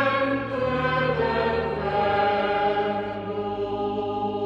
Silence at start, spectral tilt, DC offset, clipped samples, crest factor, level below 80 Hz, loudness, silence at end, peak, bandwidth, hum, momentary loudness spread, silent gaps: 0 s; -7.5 dB/octave; under 0.1%; under 0.1%; 14 dB; -46 dBFS; -25 LUFS; 0 s; -10 dBFS; 7.8 kHz; none; 6 LU; none